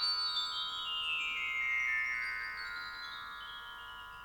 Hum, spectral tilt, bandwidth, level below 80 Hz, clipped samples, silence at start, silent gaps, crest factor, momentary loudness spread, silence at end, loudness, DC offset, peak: none; 1 dB/octave; over 20 kHz; -66 dBFS; under 0.1%; 0 s; none; 14 dB; 14 LU; 0 s; -35 LUFS; under 0.1%; -24 dBFS